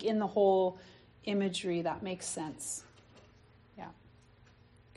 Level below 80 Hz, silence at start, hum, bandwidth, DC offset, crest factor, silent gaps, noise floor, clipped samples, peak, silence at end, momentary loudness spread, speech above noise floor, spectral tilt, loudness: -68 dBFS; 0 s; none; 11.5 kHz; under 0.1%; 18 dB; none; -61 dBFS; under 0.1%; -16 dBFS; 1.05 s; 22 LU; 29 dB; -4.5 dB/octave; -33 LUFS